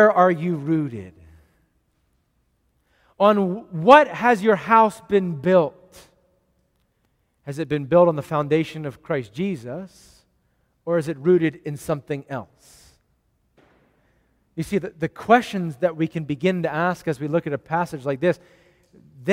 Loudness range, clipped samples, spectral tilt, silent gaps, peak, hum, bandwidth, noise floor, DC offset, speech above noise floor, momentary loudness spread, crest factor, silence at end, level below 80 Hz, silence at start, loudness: 8 LU; under 0.1%; -7 dB/octave; none; 0 dBFS; none; 15.5 kHz; -68 dBFS; under 0.1%; 48 dB; 15 LU; 22 dB; 0 s; -60 dBFS; 0 s; -21 LUFS